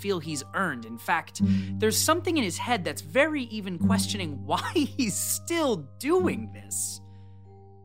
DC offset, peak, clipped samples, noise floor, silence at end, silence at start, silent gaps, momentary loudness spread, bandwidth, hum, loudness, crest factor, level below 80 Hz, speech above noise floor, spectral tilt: 0.2%; -8 dBFS; under 0.1%; -49 dBFS; 0 s; 0 s; none; 8 LU; 16 kHz; none; -27 LUFS; 20 dB; -62 dBFS; 22 dB; -4 dB/octave